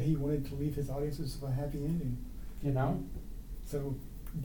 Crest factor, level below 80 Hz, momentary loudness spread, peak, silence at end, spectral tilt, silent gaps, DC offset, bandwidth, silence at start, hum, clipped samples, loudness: 14 dB; -44 dBFS; 12 LU; -20 dBFS; 0 s; -8 dB/octave; none; under 0.1%; 19 kHz; 0 s; none; under 0.1%; -37 LUFS